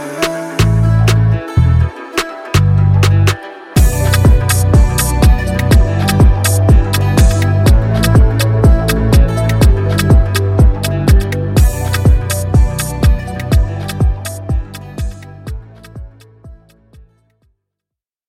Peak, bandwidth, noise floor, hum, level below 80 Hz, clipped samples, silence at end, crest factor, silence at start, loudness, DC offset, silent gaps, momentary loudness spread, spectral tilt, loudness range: 0 dBFS; 16 kHz; -84 dBFS; none; -16 dBFS; under 0.1%; 1.75 s; 10 dB; 0 s; -12 LUFS; under 0.1%; none; 10 LU; -6 dB/octave; 9 LU